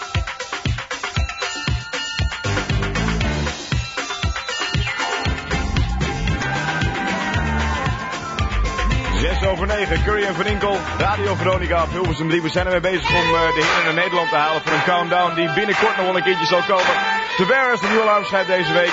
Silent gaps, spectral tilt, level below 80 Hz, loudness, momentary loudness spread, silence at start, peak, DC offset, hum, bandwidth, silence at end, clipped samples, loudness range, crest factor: none; -4.5 dB/octave; -28 dBFS; -19 LUFS; 8 LU; 0 s; -4 dBFS; under 0.1%; none; 8 kHz; 0 s; under 0.1%; 5 LU; 16 dB